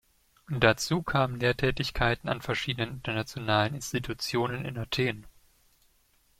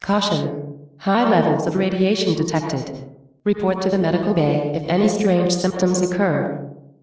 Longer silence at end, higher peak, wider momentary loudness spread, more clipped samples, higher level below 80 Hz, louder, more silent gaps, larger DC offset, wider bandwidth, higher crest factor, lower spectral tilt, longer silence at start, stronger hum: first, 1.1 s vs 0.25 s; about the same, -6 dBFS vs -4 dBFS; about the same, 8 LU vs 10 LU; neither; first, -48 dBFS vs -54 dBFS; second, -29 LUFS vs -20 LUFS; neither; neither; first, 16 kHz vs 8 kHz; first, 24 dB vs 16 dB; about the same, -5 dB/octave vs -6 dB/octave; first, 0.5 s vs 0 s; neither